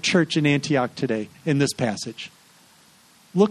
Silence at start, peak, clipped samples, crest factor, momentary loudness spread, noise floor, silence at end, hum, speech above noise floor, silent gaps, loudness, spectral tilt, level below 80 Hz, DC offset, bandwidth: 0.05 s; -4 dBFS; under 0.1%; 18 dB; 13 LU; -54 dBFS; 0 s; none; 32 dB; none; -23 LUFS; -5 dB/octave; -64 dBFS; under 0.1%; 13 kHz